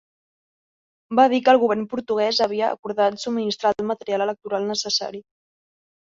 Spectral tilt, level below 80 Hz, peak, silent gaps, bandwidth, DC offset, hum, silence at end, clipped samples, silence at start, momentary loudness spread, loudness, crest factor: -3.5 dB/octave; -68 dBFS; -4 dBFS; 2.79-2.83 s; 7.6 kHz; under 0.1%; none; 0.9 s; under 0.1%; 1.1 s; 9 LU; -21 LUFS; 20 dB